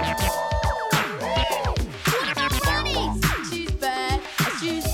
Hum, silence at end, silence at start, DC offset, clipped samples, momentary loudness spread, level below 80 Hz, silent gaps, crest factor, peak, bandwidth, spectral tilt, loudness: none; 0 s; 0 s; under 0.1%; under 0.1%; 4 LU; -32 dBFS; none; 16 dB; -8 dBFS; 18.5 kHz; -4 dB/octave; -24 LUFS